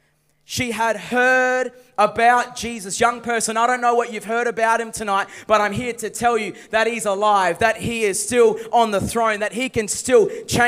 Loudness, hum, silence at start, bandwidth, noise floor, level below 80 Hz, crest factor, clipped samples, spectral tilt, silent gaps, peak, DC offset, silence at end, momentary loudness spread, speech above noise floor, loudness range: -19 LUFS; none; 0.5 s; 16 kHz; -56 dBFS; -52 dBFS; 18 dB; under 0.1%; -3 dB/octave; none; -2 dBFS; under 0.1%; 0 s; 7 LU; 37 dB; 2 LU